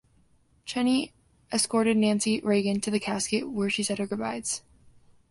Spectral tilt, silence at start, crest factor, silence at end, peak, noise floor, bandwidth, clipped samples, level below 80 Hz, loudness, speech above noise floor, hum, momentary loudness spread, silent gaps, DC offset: -4 dB/octave; 0.65 s; 16 dB; 0.7 s; -12 dBFS; -63 dBFS; 11.5 kHz; under 0.1%; -64 dBFS; -27 LUFS; 37 dB; none; 9 LU; none; under 0.1%